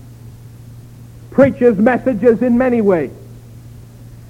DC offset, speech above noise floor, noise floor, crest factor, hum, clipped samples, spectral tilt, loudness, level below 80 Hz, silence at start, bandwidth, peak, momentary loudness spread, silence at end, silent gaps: under 0.1%; 24 dB; -36 dBFS; 16 dB; none; under 0.1%; -9 dB/octave; -13 LUFS; -44 dBFS; 0.1 s; 11 kHz; 0 dBFS; 7 LU; 0.1 s; none